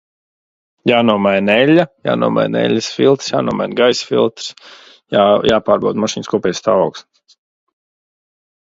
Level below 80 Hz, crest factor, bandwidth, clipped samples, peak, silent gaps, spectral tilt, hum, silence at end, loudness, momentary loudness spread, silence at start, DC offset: -54 dBFS; 16 dB; 7.8 kHz; under 0.1%; 0 dBFS; none; -5 dB/octave; none; 1.65 s; -14 LUFS; 7 LU; 0.85 s; under 0.1%